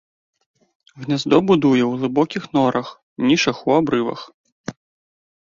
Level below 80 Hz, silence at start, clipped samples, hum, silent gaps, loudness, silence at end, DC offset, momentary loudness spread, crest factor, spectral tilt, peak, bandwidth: -58 dBFS; 0.95 s; under 0.1%; none; 3.03-3.16 s, 4.34-4.44 s, 4.52-4.64 s; -18 LUFS; 0.85 s; under 0.1%; 20 LU; 18 dB; -5.5 dB/octave; -2 dBFS; 7.6 kHz